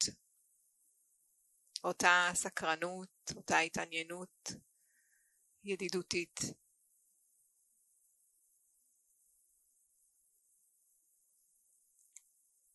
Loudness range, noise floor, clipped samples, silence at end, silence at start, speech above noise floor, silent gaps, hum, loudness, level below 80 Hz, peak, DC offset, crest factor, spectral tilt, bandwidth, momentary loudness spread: 9 LU; -75 dBFS; under 0.1%; 6.2 s; 0 s; 39 dB; none; none; -35 LUFS; -76 dBFS; -12 dBFS; under 0.1%; 30 dB; -2 dB/octave; 12 kHz; 17 LU